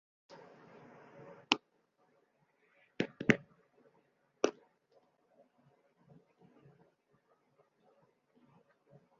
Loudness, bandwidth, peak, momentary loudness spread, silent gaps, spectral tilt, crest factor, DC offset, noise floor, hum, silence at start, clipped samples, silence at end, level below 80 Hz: -35 LUFS; 7.2 kHz; -6 dBFS; 26 LU; none; -3 dB/octave; 36 dB; under 0.1%; -76 dBFS; none; 1.25 s; under 0.1%; 4.7 s; -74 dBFS